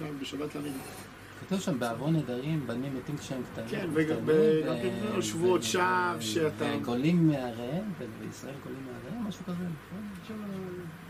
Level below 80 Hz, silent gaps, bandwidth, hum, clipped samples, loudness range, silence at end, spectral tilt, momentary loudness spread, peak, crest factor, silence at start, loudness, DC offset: -62 dBFS; none; 15 kHz; none; under 0.1%; 7 LU; 0 s; -5.5 dB/octave; 15 LU; -14 dBFS; 18 dB; 0 s; -31 LUFS; under 0.1%